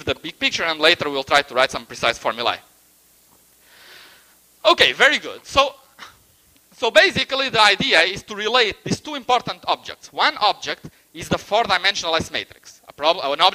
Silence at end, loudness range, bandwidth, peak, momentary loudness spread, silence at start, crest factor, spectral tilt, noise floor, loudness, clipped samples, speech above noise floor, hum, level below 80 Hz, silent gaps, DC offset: 0 s; 5 LU; 15.5 kHz; 0 dBFS; 12 LU; 0 s; 20 dB; -2.5 dB/octave; -55 dBFS; -18 LUFS; under 0.1%; 36 dB; none; -52 dBFS; none; under 0.1%